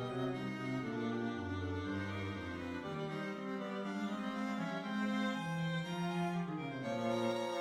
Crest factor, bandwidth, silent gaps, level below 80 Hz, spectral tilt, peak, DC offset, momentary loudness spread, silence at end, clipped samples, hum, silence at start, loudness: 14 dB; 14 kHz; none; -68 dBFS; -6.5 dB/octave; -24 dBFS; under 0.1%; 5 LU; 0 s; under 0.1%; none; 0 s; -39 LUFS